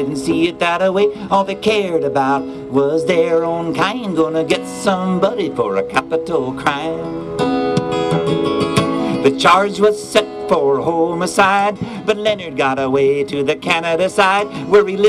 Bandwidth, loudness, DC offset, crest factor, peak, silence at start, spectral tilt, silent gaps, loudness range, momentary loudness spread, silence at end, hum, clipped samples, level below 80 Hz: 13 kHz; -16 LUFS; under 0.1%; 14 dB; -2 dBFS; 0 s; -5 dB/octave; none; 3 LU; 6 LU; 0 s; none; under 0.1%; -50 dBFS